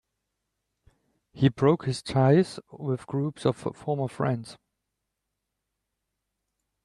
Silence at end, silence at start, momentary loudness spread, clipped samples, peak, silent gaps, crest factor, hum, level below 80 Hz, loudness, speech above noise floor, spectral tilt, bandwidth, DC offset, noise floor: 2.3 s; 1.35 s; 12 LU; under 0.1%; -8 dBFS; none; 20 dB; none; -62 dBFS; -26 LUFS; 57 dB; -7.5 dB/octave; 11.5 kHz; under 0.1%; -83 dBFS